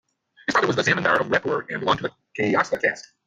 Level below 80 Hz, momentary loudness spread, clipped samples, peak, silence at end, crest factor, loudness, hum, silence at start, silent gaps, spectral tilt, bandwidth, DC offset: -60 dBFS; 7 LU; under 0.1%; -6 dBFS; 0.25 s; 16 dB; -22 LUFS; none; 0.5 s; none; -4.5 dB/octave; 10 kHz; under 0.1%